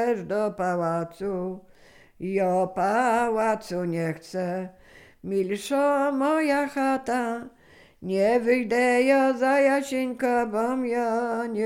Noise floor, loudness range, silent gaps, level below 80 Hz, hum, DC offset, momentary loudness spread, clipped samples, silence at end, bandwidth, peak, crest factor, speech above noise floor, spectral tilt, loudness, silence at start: -53 dBFS; 4 LU; none; -62 dBFS; none; under 0.1%; 10 LU; under 0.1%; 0 s; 16 kHz; -10 dBFS; 16 dB; 29 dB; -6 dB/octave; -25 LUFS; 0 s